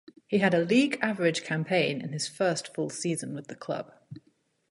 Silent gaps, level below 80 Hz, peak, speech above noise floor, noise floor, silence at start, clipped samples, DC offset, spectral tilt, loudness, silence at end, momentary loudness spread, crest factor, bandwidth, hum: none; -74 dBFS; -10 dBFS; 41 dB; -69 dBFS; 0.3 s; under 0.1%; under 0.1%; -5 dB/octave; -28 LUFS; 0.55 s; 12 LU; 20 dB; 11.5 kHz; none